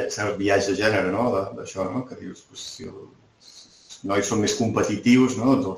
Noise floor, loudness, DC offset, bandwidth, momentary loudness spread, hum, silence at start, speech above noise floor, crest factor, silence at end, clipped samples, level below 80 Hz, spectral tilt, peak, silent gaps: -50 dBFS; -22 LUFS; under 0.1%; 14.5 kHz; 19 LU; none; 0 s; 27 dB; 18 dB; 0 s; under 0.1%; -56 dBFS; -5 dB/octave; -4 dBFS; none